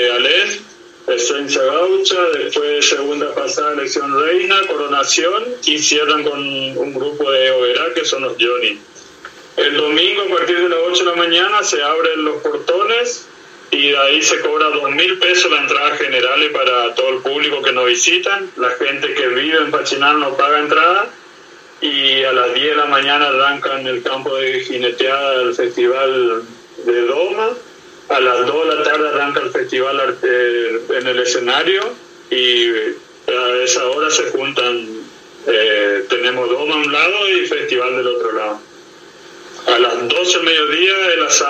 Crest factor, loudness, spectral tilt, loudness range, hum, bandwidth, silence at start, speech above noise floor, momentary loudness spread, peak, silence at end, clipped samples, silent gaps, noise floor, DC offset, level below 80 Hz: 16 dB; -14 LUFS; -1 dB/octave; 3 LU; none; 13 kHz; 0 s; 25 dB; 8 LU; 0 dBFS; 0 s; under 0.1%; none; -40 dBFS; under 0.1%; -70 dBFS